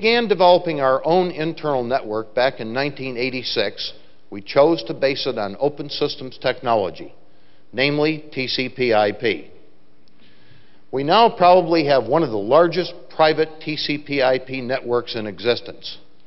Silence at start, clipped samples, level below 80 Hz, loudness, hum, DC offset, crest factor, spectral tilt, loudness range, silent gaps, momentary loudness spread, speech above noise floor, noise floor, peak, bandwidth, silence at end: 0 s; under 0.1%; -56 dBFS; -19 LUFS; none; 1%; 20 dB; -3 dB/octave; 6 LU; none; 11 LU; 38 dB; -57 dBFS; 0 dBFS; 6 kHz; 0.3 s